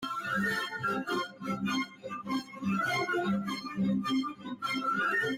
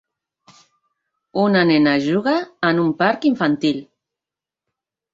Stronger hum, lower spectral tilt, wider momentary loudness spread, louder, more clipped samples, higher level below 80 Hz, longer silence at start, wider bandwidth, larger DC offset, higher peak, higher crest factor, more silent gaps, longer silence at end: neither; second, -5 dB/octave vs -7 dB/octave; about the same, 7 LU vs 7 LU; second, -32 LUFS vs -18 LUFS; neither; second, -70 dBFS vs -62 dBFS; second, 0 s vs 1.35 s; first, 16.5 kHz vs 7.6 kHz; neither; second, -20 dBFS vs -2 dBFS; second, 12 dB vs 18 dB; neither; second, 0 s vs 1.3 s